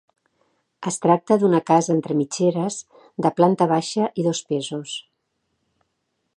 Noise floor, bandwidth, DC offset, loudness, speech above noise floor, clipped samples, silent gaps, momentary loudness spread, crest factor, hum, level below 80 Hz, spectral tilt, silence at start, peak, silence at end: -74 dBFS; 11.5 kHz; under 0.1%; -21 LUFS; 54 dB; under 0.1%; none; 13 LU; 20 dB; none; -72 dBFS; -5.5 dB/octave; 0.8 s; -2 dBFS; 1.35 s